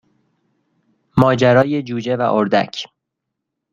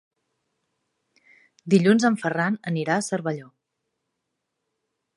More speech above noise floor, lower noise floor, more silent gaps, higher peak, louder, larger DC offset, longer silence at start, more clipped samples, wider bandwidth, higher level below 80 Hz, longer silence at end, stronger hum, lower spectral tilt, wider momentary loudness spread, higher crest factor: first, 63 dB vs 58 dB; about the same, -79 dBFS vs -80 dBFS; neither; first, -2 dBFS vs -6 dBFS; first, -16 LUFS vs -22 LUFS; neither; second, 1.15 s vs 1.65 s; neither; second, 7.6 kHz vs 11.5 kHz; first, -50 dBFS vs -74 dBFS; second, 0.85 s vs 1.75 s; neither; about the same, -7 dB/octave vs -6 dB/octave; about the same, 13 LU vs 13 LU; about the same, 16 dB vs 20 dB